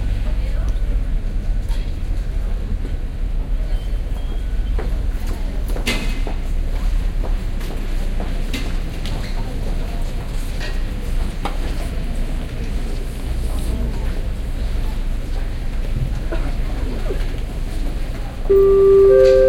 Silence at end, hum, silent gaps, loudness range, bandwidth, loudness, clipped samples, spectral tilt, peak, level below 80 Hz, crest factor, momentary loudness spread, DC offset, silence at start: 0 s; none; none; 3 LU; 13.5 kHz; -22 LUFS; under 0.1%; -6.5 dB/octave; -2 dBFS; -20 dBFS; 16 dB; 6 LU; under 0.1%; 0 s